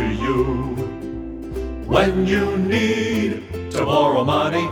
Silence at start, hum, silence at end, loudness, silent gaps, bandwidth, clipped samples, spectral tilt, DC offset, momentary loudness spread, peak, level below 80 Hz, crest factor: 0 s; none; 0 s; -20 LUFS; none; 19 kHz; under 0.1%; -6 dB/octave; under 0.1%; 12 LU; 0 dBFS; -34 dBFS; 20 dB